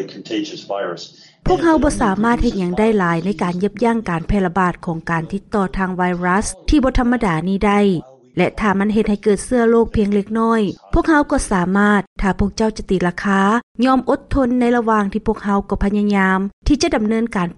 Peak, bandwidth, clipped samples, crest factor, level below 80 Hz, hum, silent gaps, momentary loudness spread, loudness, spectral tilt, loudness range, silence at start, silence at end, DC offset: -4 dBFS; 11.5 kHz; under 0.1%; 12 dB; -30 dBFS; none; 12.07-12.16 s, 13.63-13.75 s, 16.53-16.62 s; 7 LU; -17 LUFS; -6 dB/octave; 2 LU; 0 s; 0.05 s; under 0.1%